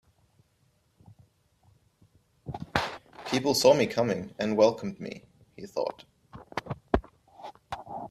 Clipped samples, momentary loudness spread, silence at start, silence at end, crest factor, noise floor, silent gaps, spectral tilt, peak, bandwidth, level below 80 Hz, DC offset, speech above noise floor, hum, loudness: under 0.1%; 24 LU; 2.45 s; 0.05 s; 26 dB; -69 dBFS; none; -4.5 dB/octave; -4 dBFS; 15 kHz; -50 dBFS; under 0.1%; 43 dB; none; -28 LUFS